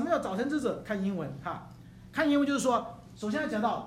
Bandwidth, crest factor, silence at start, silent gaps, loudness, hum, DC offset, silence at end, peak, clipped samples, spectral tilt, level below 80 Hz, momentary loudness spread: 15 kHz; 18 dB; 0 s; none; -31 LUFS; none; under 0.1%; 0 s; -14 dBFS; under 0.1%; -5.5 dB/octave; -60 dBFS; 15 LU